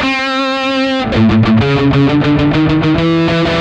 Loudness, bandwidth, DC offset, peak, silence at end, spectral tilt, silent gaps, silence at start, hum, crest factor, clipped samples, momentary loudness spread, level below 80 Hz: -12 LUFS; 9 kHz; under 0.1%; -2 dBFS; 0 s; -7 dB/octave; none; 0 s; none; 10 dB; under 0.1%; 4 LU; -30 dBFS